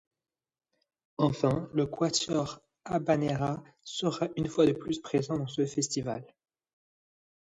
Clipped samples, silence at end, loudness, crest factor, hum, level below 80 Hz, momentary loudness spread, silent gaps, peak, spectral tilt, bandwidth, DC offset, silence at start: under 0.1%; 1.35 s; -30 LUFS; 20 dB; none; -62 dBFS; 12 LU; none; -12 dBFS; -5 dB/octave; 10.5 kHz; under 0.1%; 1.2 s